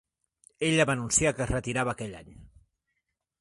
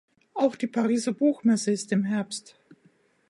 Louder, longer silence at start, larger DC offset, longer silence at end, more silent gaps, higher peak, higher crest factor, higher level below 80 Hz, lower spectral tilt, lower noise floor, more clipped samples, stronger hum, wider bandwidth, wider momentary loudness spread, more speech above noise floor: about the same, -27 LUFS vs -26 LUFS; first, 0.6 s vs 0.35 s; neither; about the same, 0.95 s vs 0.9 s; neither; about the same, -10 dBFS vs -10 dBFS; about the same, 22 dB vs 18 dB; first, -48 dBFS vs -78 dBFS; second, -3.5 dB/octave vs -5.5 dB/octave; first, -82 dBFS vs -63 dBFS; neither; neither; about the same, 11.5 kHz vs 11.5 kHz; first, 14 LU vs 10 LU; first, 54 dB vs 38 dB